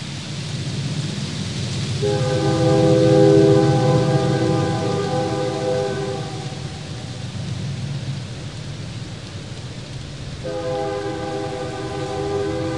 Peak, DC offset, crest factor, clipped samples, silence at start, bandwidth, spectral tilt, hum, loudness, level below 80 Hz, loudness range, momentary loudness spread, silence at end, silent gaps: -2 dBFS; 0.4%; 18 dB; under 0.1%; 0 s; 11.5 kHz; -6.5 dB/octave; none; -21 LUFS; -46 dBFS; 13 LU; 17 LU; 0 s; none